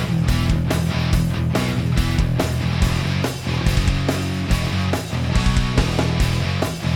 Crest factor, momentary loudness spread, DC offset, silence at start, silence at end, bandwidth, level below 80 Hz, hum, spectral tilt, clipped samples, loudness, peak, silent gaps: 14 dB; 3 LU; under 0.1%; 0 s; 0 s; 18 kHz; -26 dBFS; none; -5.5 dB/octave; under 0.1%; -20 LUFS; -4 dBFS; none